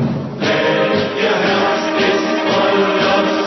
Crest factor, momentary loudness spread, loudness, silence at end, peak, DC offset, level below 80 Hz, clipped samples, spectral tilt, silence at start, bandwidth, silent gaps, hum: 12 dB; 2 LU; -15 LUFS; 0 s; -2 dBFS; under 0.1%; -52 dBFS; under 0.1%; -5 dB/octave; 0 s; 6.2 kHz; none; none